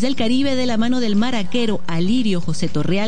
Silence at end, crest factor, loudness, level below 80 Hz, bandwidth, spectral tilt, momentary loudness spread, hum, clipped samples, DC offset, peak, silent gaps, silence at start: 0 s; 12 dB; -20 LUFS; -46 dBFS; 10 kHz; -5.5 dB/octave; 4 LU; none; under 0.1%; 10%; -6 dBFS; none; 0 s